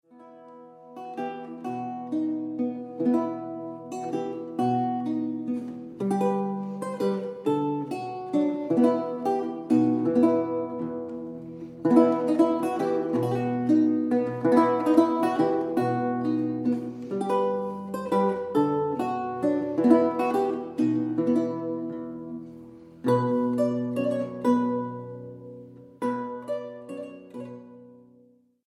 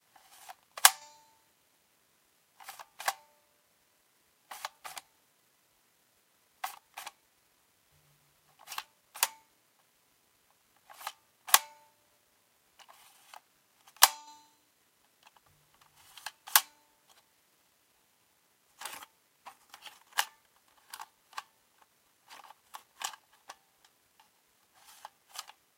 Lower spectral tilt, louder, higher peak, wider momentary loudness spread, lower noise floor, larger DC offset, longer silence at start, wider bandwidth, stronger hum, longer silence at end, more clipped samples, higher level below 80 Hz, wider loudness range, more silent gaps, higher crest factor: first, -8 dB/octave vs 3.5 dB/octave; first, -26 LUFS vs -30 LUFS; second, -6 dBFS vs 0 dBFS; second, 16 LU vs 30 LU; second, -59 dBFS vs -70 dBFS; neither; second, 0.15 s vs 0.5 s; second, 12 kHz vs 16.5 kHz; neither; first, 0.7 s vs 0.35 s; neither; first, -72 dBFS vs -88 dBFS; second, 7 LU vs 17 LU; neither; second, 20 dB vs 38 dB